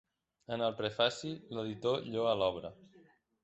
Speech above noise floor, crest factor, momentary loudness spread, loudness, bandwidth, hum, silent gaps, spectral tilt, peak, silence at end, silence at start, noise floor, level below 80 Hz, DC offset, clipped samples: 30 dB; 22 dB; 11 LU; -35 LUFS; 8.2 kHz; none; none; -5 dB/octave; -14 dBFS; 0.6 s; 0.5 s; -65 dBFS; -68 dBFS; under 0.1%; under 0.1%